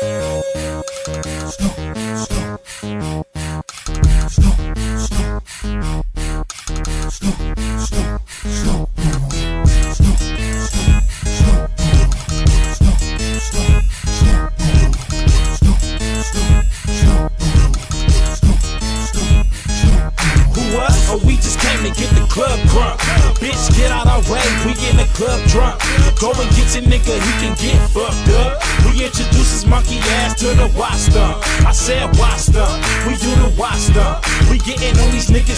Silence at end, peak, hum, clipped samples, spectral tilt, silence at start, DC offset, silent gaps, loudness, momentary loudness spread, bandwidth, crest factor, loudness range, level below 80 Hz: 0 s; -2 dBFS; none; under 0.1%; -4.5 dB/octave; 0 s; under 0.1%; none; -16 LUFS; 9 LU; 11 kHz; 10 dB; 7 LU; -14 dBFS